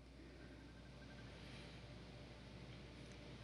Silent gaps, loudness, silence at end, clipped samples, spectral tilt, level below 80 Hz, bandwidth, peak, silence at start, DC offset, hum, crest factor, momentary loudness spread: none; -58 LUFS; 0 s; under 0.1%; -5.5 dB/octave; -64 dBFS; 11.5 kHz; -44 dBFS; 0 s; under 0.1%; none; 14 dB; 3 LU